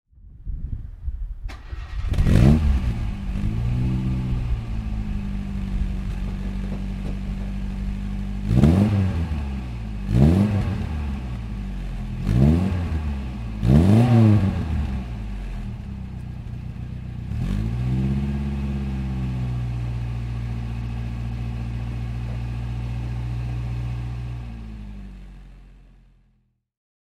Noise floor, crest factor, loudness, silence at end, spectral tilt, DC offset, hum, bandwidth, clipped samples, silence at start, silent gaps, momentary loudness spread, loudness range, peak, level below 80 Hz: -66 dBFS; 22 dB; -24 LUFS; 1.25 s; -8.5 dB/octave; under 0.1%; none; 11.5 kHz; under 0.1%; 0.25 s; none; 17 LU; 10 LU; -2 dBFS; -28 dBFS